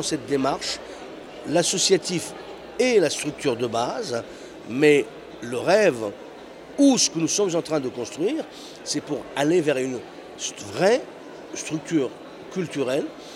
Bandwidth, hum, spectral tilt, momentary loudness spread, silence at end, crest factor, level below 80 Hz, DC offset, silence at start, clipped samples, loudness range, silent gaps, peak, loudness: 16 kHz; none; -3.5 dB/octave; 18 LU; 0 s; 20 dB; -62 dBFS; under 0.1%; 0 s; under 0.1%; 4 LU; none; -4 dBFS; -23 LUFS